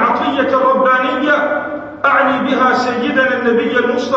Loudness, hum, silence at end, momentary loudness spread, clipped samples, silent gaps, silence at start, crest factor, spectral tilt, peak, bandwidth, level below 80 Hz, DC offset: -13 LUFS; none; 0 s; 4 LU; under 0.1%; none; 0 s; 12 dB; -5 dB/octave; -2 dBFS; 7.8 kHz; -56 dBFS; under 0.1%